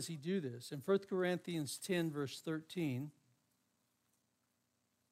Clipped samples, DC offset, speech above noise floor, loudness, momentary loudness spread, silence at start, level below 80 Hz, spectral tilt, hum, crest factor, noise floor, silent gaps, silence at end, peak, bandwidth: under 0.1%; under 0.1%; 43 dB; -40 LUFS; 9 LU; 0 s; -86 dBFS; -5.5 dB/octave; 60 Hz at -65 dBFS; 18 dB; -82 dBFS; none; 2 s; -22 dBFS; 16 kHz